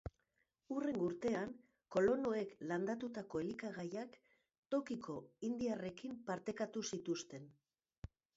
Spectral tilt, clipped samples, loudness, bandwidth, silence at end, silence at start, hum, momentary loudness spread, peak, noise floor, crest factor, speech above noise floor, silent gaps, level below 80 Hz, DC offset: -5.5 dB/octave; under 0.1%; -42 LUFS; 7.6 kHz; 0.85 s; 0.05 s; none; 15 LU; -24 dBFS; -84 dBFS; 18 dB; 43 dB; 4.58-4.63 s; -68 dBFS; under 0.1%